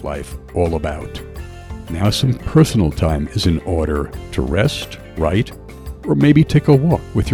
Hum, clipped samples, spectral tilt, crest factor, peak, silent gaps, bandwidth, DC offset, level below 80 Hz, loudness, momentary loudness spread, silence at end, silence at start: none; under 0.1%; -6.5 dB/octave; 16 dB; 0 dBFS; none; 18 kHz; under 0.1%; -30 dBFS; -17 LUFS; 18 LU; 0 s; 0 s